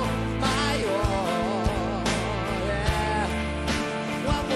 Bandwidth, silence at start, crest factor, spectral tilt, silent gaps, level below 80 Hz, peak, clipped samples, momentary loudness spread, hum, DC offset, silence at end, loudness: 13 kHz; 0 s; 12 dB; -5 dB/octave; none; -34 dBFS; -12 dBFS; under 0.1%; 3 LU; none; under 0.1%; 0 s; -26 LUFS